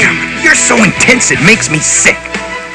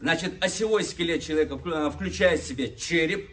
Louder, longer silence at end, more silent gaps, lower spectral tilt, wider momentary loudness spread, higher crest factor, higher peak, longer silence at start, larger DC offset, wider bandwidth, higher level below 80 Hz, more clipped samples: first, -7 LUFS vs -26 LUFS; about the same, 0 s vs 0 s; neither; second, -2.5 dB/octave vs -4 dB/octave; first, 8 LU vs 5 LU; second, 10 dB vs 20 dB; first, 0 dBFS vs -6 dBFS; about the same, 0 s vs 0 s; neither; first, 11 kHz vs 8 kHz; first, -36 dBFS vs -46 dBFS; first, 2% vs under 0.1%